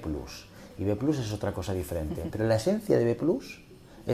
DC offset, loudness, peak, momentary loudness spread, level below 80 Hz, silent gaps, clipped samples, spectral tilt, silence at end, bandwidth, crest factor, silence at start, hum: under 0.1%; -29 LUFS; -12 dBFS; 18 LU; -48 dBFS; none; under 0.1%; -7 dB/octave; 0 s; 15.5 kHz; 18 dB; 0 s; none